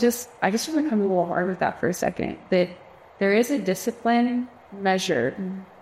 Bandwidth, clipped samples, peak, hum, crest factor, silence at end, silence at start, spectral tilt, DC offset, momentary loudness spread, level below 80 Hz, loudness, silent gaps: 16 kHz; under 0.1%; -8 dBFS; none; 16 dB; 0.15 s; 0 s; -5 dB/octave; under 0.1%; 7 LU; -60 dBFS; -24 LUFS; none